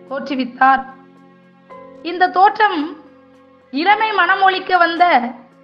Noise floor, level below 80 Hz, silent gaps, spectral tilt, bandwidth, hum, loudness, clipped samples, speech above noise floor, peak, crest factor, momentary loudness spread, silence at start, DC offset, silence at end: -47 dBFS; -62 dBFS; none; -5 dB/octave; 6.2 kHz; none; -15 LUFS; under 0.1%; 33 dB; 0 dBFS; 16 dB; 15 LU; 0.1 s; under 0.1%; 0.25 s